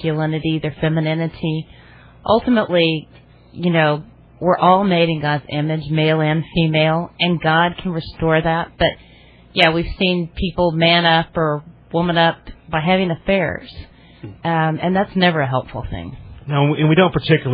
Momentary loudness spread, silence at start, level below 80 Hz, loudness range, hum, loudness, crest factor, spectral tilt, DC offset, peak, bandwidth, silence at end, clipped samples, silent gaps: 12 LU; 0 s; -40 dBFS; 3 LU; none; -17 LUFS; 18 dB; -8.5 dB/octave; under 0.1%; 0 dBFS; 5 kHz; 0 s; under 0.1%; none